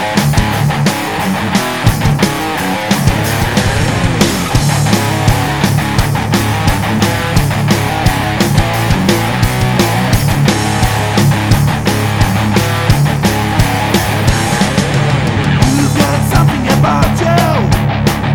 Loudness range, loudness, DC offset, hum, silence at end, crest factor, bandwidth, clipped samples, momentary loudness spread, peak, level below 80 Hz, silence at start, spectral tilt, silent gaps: 1 LU; -12 LUFS; 1%; none; 0 s; 12 dB; 20 kHz; under 0.1%; 2 LU; 0 dBFS; -24 dBFS; 0 s; -5 dB/octave; none